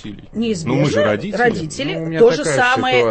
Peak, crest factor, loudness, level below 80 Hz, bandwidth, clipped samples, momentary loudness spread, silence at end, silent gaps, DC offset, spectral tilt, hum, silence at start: -2 dBFS; 16 dB; -16 LUFS; -46 dBFS; 8.8 kHz; under 0.1%; 9 LU; 0 s; none; under 0.1%; -5 dB/octave; none; 0.05 s